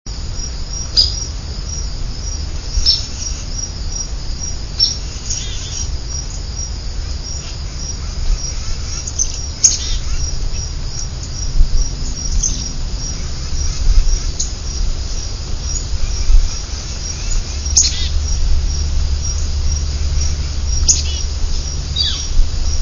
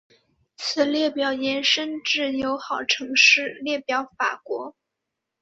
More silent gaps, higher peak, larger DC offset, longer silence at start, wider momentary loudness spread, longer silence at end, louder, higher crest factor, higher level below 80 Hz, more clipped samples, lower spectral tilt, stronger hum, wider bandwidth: neither; first, 0 dBFS vs -4 dBFS; neither; second, 0.05 s vs 0.6 s; second, 11 LU vs 14 LU; second, 0 s vs 0.7 s; about the same, -19 LUFS vs -21 LUFS; about the same, 16 dB vs 20 dB; first, -18 dBFS vs -66 dBFS; neither; about the same, -2 dB/octave vs -1 dB/octave; neither; about the same, 7.4 kHz vs 8 kHz